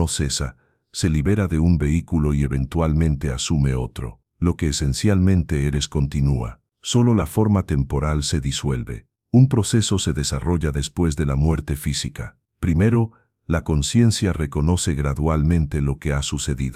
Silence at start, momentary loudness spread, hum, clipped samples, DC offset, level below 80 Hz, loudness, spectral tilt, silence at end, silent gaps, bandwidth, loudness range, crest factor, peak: 0 s; 9 LU; none; under 0.1%; under 0.1%; -30 dBFS; -21 LUFS; -6 dB/octave; 0 s; none; 15 kHz; 2 LU; 16 dB; -4 dBFS